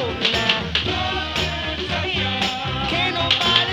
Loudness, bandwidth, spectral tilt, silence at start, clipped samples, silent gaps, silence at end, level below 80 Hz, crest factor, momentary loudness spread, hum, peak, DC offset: -20 LUFS; 18.5 kHz; -4 dB/octave; 0 s; under 0.1%; none; 0 s; -38 dBFS; 20 dB; 6 LU; none; -2 dBFS; under 0.1%